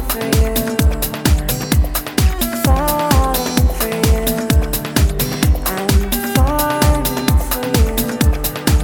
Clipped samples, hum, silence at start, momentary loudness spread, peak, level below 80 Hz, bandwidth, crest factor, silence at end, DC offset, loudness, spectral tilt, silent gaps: under 0.1%; none; 0 s; 3 LU; -2 dBFS; -18 dBFS; 20 kHz; 12 dB; 0 s; under 0.1%; -16 LUFS; -5 dB/octave; none